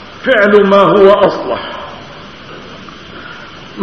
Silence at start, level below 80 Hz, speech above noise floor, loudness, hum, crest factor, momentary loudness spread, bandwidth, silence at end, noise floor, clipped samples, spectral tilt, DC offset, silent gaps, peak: 0 s; -44 dBFS; 23 dB; -9 LUFS; none; 12 dB; 24 LU; 6.6 kHz; 0 s; -31 dBFS; 0.7%; -6.5 dB/octave; 0.6%; none; 0 dBFS